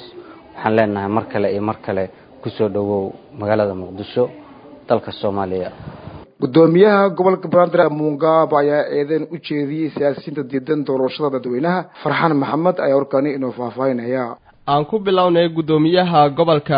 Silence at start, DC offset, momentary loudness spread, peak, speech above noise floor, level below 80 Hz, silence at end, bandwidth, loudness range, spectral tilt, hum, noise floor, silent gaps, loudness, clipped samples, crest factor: 0 s; under 0.1%; 11 LU; 0 dBFS; 22 dB; -54 dBFS; 0 s; 5.2 kHz; 7 LU; -11 dB/octave; none; -39 dBFS; none; -18 LUFS; under 0.1%; 18 dB